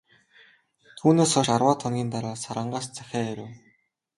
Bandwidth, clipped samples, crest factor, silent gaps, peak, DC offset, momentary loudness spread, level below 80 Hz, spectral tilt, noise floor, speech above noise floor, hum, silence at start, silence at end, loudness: 11.5 kHz; under 0.1%; 22 dB; none; -6 dBFS; under 0.1%; 13 LU; -62 dBFS; -5 dB/octave; -66 dBFS; 42 dB; none; 0.95 s; 0.6 s; -25 LUFS